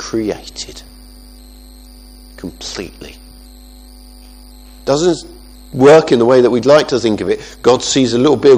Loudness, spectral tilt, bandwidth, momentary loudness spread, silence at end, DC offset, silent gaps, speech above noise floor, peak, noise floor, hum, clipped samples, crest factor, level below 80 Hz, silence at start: -12 LUFS; -5 dB/octave; 15 kHz; 22 LU; 0 s; under 0.1%; none; 25 dB; 0 dBFS; -37 dBFS; 50 Hz at -40 dBFS; 0.2%; 14 dB; -40 dBFS; 0 s